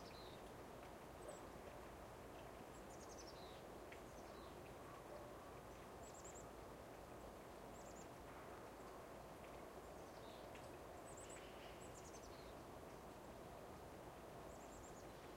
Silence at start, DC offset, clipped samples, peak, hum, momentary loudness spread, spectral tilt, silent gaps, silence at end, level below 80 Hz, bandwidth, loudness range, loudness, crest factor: 0 s; under 0.1%; under 0.1%; -42 dBFS; none; 2 LU; -4.5 dB/octave; none; 0 s; -68 dBFS; 16 kHz; 1 LU; -57 LUFS; 14 dB